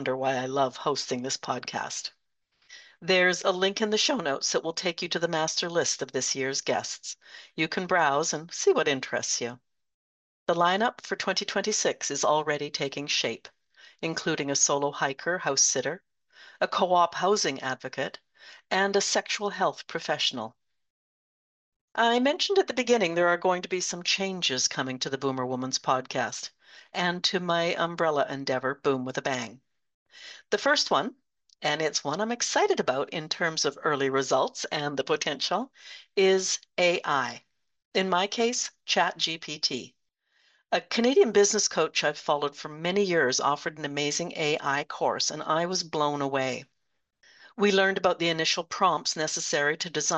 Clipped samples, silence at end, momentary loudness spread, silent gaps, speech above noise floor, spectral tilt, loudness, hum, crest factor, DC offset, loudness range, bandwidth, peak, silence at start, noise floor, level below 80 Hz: under 0.1%; 0 s; 9 LU; 9.94-10.46 s, 20.90-21.88 s, 29.94-30.06 s, 37.85-37.92 s; 53 dB; -2.5 dB/octave; -27 LUFS; none; 20 dB; under 0.1%; 3 LU; 8.8 kHz; -8 dBFS; 0 s; -80 dBFS; -76 dBFS